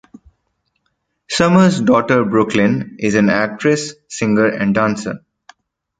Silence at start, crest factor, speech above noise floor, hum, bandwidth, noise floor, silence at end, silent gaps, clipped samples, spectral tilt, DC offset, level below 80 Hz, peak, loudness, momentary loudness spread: 1.3 s; 16 dB; 55 dB; none; 9.4 kHz; -69 dBFS; 0.85 s; none; under 0.1%; -5.5 dB/octave; under 0.1%; -50 dBFS; -2 dBFS; -15 LUFS; 11 LU